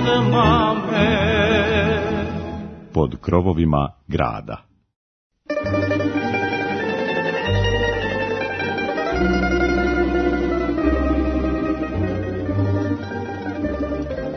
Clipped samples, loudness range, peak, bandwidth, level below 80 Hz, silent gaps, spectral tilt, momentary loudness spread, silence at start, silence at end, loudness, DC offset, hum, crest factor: under 0.1%; 4 LU; -2 dBFS; 6.6 kHz; -32 dBFS; 4.96-5.30 s; -7 dB/octave; 9 LU; 0 s; 0 s; -20 LUFS; under 0.1%; none; 18 dB